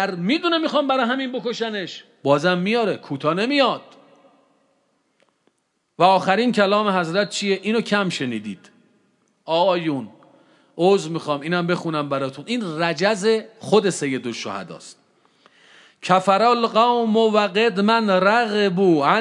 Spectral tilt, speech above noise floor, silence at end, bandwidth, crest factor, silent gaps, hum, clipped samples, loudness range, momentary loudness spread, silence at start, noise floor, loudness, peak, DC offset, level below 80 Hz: -5 dB/octave; 51 dB; 0 s; 11.5 kHz; 18 dB; none; none; under 0.1%; 6 LU; 11 LU; 0 s; -70 dBFS; -20 LUFS; -2 dBFS; under 0.1%; -78 dBFS